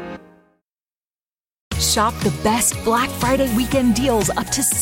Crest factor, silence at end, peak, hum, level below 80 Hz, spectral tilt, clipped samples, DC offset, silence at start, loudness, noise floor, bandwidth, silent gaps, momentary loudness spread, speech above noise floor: 16 dB; 0 s; -6 dBFS; none; -36 dBFS; -3.5 dB/octave; under 0.1%; under 0.1%; 0 s; -18 LUFS; under -90 dBFS; 17 kHz; 1.61-1.71 s; 4 LU; over 72 dB